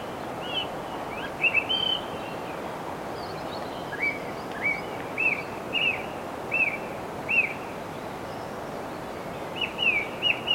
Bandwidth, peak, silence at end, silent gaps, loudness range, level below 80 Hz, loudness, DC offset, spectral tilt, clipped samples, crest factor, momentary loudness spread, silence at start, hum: 16.5 kHz; -10 dBFS; 0 s; none; 3 LU; -58 dBFS; -28 LUFS; under 0.1%; -3.5 dB/octave; under 0.1%; 18 dB; 12 LU; 0 s; none